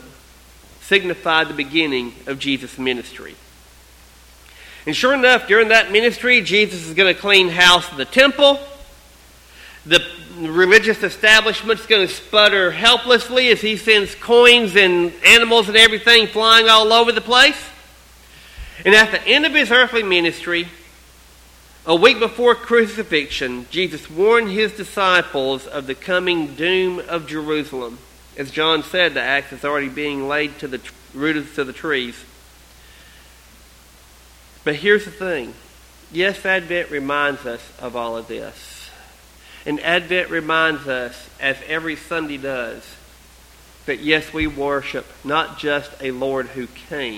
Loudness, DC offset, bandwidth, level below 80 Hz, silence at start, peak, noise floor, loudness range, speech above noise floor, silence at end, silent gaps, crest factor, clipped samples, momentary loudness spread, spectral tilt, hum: -15 LUFS; under 0.1%; 16.5 kHz; -48 dBFS; 0.8 s; 0 dBFS; -46 dBFS; 13 LU; 30 dB; 0 s; none; 18 dB; under 0.1%; 18 LU; -2.5 dB/octave; none